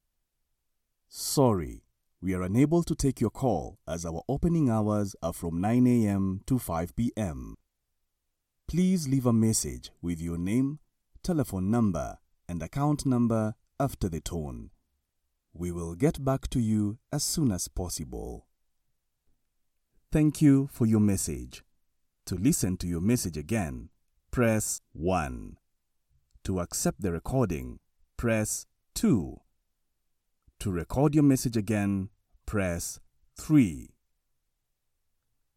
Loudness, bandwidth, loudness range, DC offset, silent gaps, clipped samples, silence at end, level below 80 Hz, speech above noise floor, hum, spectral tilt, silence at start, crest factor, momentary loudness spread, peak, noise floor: -28 LUFS; 16.5 kHz; 4 LU; under 0.1%; none; under 0.1%; 1.7 s; -48 dBFS; 53 dB; none; -6 dB/octave; 1.15 s; 20 dB; 15 LU; -10 dBFS; -81 dBFS